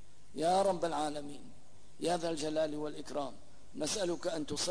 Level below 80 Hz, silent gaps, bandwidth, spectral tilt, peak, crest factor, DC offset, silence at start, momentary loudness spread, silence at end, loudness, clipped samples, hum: -64 dBFS; none; 11 kHz; -3.5 dB/octave; -20 dBFS; 16 dB; 0.7%; 0.3 s; 15 LU; 0 s; -35 LUFS; under 0.1%; none